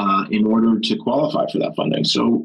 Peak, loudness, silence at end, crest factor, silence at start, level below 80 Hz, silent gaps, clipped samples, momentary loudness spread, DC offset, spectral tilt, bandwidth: -8 dBFS; -18 LUFS; 0 s; 10 dB; 0 s; -60 dBFS; none; under 0.1%; 5 LU; under 0.1%; -5.5 dB/octave; 10 kHz